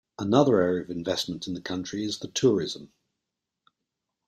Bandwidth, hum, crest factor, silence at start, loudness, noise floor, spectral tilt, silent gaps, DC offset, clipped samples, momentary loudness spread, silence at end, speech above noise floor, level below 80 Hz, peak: 13.5 kHz; none; 22 dB; 0.2 s; -26 LUFS; -85 dBFS; -5 dB/octave; none; under 0.1%; under 0.1%; 12 LU; 1.4 s; 59 dB; -64 dBFS; -6 dBFS